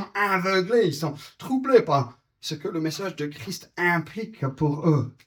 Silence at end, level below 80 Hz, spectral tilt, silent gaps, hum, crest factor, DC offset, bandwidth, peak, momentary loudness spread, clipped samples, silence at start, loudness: 0.15 s; -62 dBFS; -6 dB/octave; none; none; 20 dB; under 0.1%; over 20 kHz; -6 dBFS; 15 LU; under 0.1%; 0 s; -24 LUFS